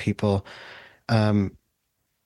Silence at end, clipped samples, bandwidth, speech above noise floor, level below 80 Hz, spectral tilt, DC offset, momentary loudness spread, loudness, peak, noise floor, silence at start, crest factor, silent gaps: 0.75 s; under 0.1%; 11 kHz; 52 dB; -56 dBFS; -7.5 dB/octave; under 0.1%; 20 LU; -24 LUFS; -8 dBFS; -75 dBFS; 0 s; 18 dB; none